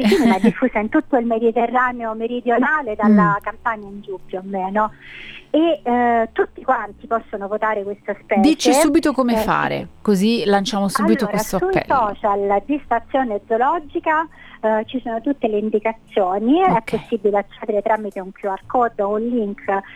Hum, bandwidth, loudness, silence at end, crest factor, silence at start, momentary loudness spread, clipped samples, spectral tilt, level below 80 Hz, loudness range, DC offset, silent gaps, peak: none; 17.5 kHz; -19 LUFS; 0.05 s; 18 dB; 0 s; 10 LU; under 0.1%; -5.5 dB/octave; -46 dBFS; 3 LU; under 0.1%; none; -2 dBFS